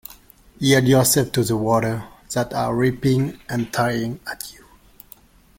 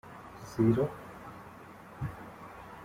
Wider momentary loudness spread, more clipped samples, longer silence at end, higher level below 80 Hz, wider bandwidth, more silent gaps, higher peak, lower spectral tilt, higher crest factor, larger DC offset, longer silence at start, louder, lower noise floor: second, 16 LU vs 22 LU; neither; first, 1.05 s vs 0 s; first, -48 dBFS vs -58 dBFS; about the same, 17 kHz vs 16 kHz; neither; first, -2 dBFS vs -14 dBFS; second, -5 dB/octave vs -8.5 dB/octave; about the same, 20 dB vs 20 dB; neither; first, 0.6 s vs 0.05 s; first, -20 LUFS vs -32 LUFS; about the same, -49 dBFS vs -50 dBFS